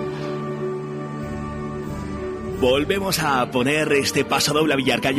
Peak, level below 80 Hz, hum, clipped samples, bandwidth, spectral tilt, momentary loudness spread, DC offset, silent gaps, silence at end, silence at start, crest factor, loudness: -8 dBFS; -44 dBFS; none; under 0.1%; 16 kHz; -4 dB/octave; 11 LU; under 0.1%; none; 0 s; 0 s; 14 dB; -22 LUFS